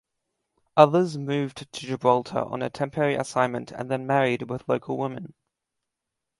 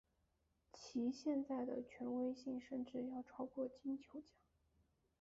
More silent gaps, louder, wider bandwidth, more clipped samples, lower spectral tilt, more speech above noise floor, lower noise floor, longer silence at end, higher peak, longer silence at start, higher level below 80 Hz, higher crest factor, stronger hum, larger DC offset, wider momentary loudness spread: neither; first, -25 LUFS vs -46 LUFS; first, 11.5 kHz vs 7.6 kHz; neither; about the same, -6 dB/octave vs -5.5 dB/octave; first, 60 dB vs 38 dB; about the same, -84 dBFS vs -83 dBFS; about the same, 1.1 s vs 1 s; first, 0 dBFS vs -32 dBFS; about the same, 0.75 s vs 0.75 s; first, -66 dBFS vs -80 dBFS; first, 26 dB vs 16 dB; neither; neither; first, 14 LU vs 10 LU